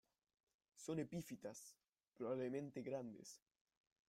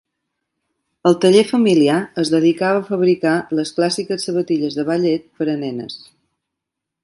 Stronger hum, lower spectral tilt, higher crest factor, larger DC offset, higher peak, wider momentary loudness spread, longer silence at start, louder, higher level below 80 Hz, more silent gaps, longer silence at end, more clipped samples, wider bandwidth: neither; about the same, -6 dB/octave vs -5.5 dB/octave; about the same, 18 dB vs 18 dB; neither; second, -34 dBFS vs 0 dBFS; first, 14 LU vs 9 LU; second, 0.75 s vs 1.05 s; second, -50 LUFS vs -17 LUFS; second, -84 dBFS vs -64 dBFS; neither; second, 0.7 s vs 1.05 s; neither; first, 16 kHz vs 11.5 kHz